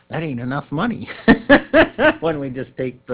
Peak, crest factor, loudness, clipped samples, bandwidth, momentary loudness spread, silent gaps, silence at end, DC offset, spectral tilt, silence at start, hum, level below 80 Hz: 0 dBFS; 18 dB; -17 LUFS; under 0.1%; 4 kHz; 14 LU; none; 0 s; under 0.1%; -10 dB/octave; 0.1 s; none; -42 dBFS